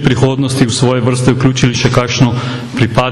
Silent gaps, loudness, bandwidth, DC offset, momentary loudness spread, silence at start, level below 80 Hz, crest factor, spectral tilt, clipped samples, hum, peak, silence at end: none; -12 LUFS; 12 kHz; under 0.1%; 3 LU; 0 s; -36 dBFS; 12 dB; -5.5 dB/octave; under 0.1%; none; 0 dBFS; 0 s